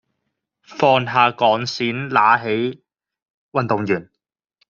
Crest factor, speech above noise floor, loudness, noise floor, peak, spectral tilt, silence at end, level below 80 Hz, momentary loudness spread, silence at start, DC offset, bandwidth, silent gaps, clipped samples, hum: 18 dB; 62 dB; -18 LUFS; -80 dBFS; -2 dBFS; -3 dB/octave; 0.65 s; -64 dBFS; 9 LU; 0.7 s; under 0.1%; 7.4 kHz; 3.30-3.49 s; under 0.1%; none